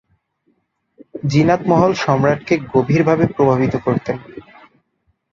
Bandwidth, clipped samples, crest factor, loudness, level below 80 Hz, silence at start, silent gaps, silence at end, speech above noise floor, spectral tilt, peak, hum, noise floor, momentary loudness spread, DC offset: 7.4 kHz; under 0.1%; 16 dB; -16 LUFS; -48 dBFS; 1.15 s; none; 0.9 s; 51 dB; -7.5 dB/octave; -2 dBFS; none; -66 dBFS; 12 LU; under 0.1%